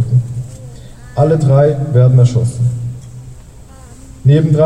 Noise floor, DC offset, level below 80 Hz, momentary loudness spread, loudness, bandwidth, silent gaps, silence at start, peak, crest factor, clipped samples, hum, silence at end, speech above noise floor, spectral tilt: -35 dBFS; under 0.1%; -38 dBFS; 22 LU; -12 LUFS; 10.5 kHz; none; 0 s; -2 dBFS; 12 dB; under 0.1%; none; 0 s; 26 dB; -9 dB/octave